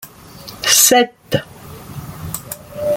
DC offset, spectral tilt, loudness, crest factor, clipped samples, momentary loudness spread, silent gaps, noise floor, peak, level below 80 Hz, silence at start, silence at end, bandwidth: under 0.1%; -2 dB/octave; -13 LUFS; 18 dB; under 0.1%; 26 LU; none; -37 dBFS; 0 dBFS; -48 dBFS; 0 s; 0 s; 17 kHz